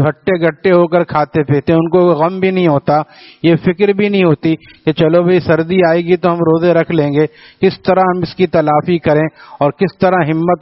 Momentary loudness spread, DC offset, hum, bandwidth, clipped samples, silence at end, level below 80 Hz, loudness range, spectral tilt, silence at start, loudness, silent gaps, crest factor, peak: 5 LU; under 0.1%; none; 5.8 kHz; under 0.1%; 0.05 s; -48 dBFS; 1 LU; -6 dB/octave; 0 s; -13 LUFS; none; 12 dB; 0 dBFS